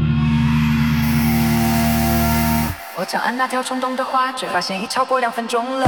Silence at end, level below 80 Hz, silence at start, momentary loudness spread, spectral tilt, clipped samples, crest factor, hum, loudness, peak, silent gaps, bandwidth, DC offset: 0 s; -32 dBFS; 0 s; 5 LU; -5.5 dB/octave; under 0.1%; 14 dB; none; -18 LUFS; -4 dBFS; none; over 20 kHz; 0.1%